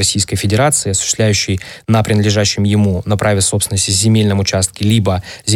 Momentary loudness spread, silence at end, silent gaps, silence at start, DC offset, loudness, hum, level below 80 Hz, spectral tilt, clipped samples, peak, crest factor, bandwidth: 3 LU; 0 s; none; 0 s; under 0.1%; -14 LUFS; none; -40 dBFS; -4 dB/octave; under 0.1%; 0 dBFS; 12 dB; 15.5 kHz